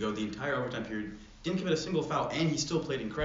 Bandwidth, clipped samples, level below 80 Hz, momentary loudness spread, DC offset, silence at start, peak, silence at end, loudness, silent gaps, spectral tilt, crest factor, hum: 7.4 kHz; under 0.1%; -56 dBFS; 8 LU; under 0.1%; 0 s; -16 dBFS; 0 s; -33 LUFS; none; -4.5 dB/octave; 16 dB; none